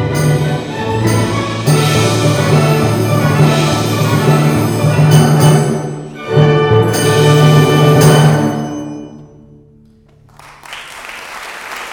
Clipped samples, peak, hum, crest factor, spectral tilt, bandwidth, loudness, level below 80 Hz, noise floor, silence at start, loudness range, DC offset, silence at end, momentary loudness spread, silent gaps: under 0.1%; 0 dBFS; none; 12 dB; -6 dB/octave; 20 kHz; -11 LUFS; -40 dBFS; -45 dBFS; 0 s; 6 LU; under 0.1%; 0 s; 18 LU; none